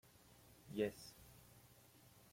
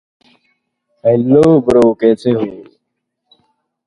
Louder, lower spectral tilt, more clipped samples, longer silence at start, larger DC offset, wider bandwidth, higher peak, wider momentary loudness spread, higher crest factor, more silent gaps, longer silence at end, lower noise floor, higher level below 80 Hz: second, -46 LUFS vs -12 LUFS; second, -5.5 dB/octave vs -8.5 dB/octave; neither; second, 0.25 s vs 1.05 s; neither; first, 16.5 kHz vs 11 kHz; second, -26 dBFS vs 0 dBFS; first, 22 LU vs 9 LU; first, 24 dB vs 14 dB; neither; second, 0 s vs 1.25 s; second, -67 dBFS vs -73 dBFS; second, -74 dBFS vs -48 dBFS